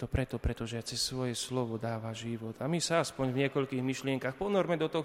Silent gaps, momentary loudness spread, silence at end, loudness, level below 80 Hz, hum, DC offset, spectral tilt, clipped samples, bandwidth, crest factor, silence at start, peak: none; 8 LU; 0 s; -33 LUFS; -48 dBFS; none; under 0.1%; -5 dB/octave; under 0.1%; 16 kHz; 16 dB; 0 s; -16 dBFS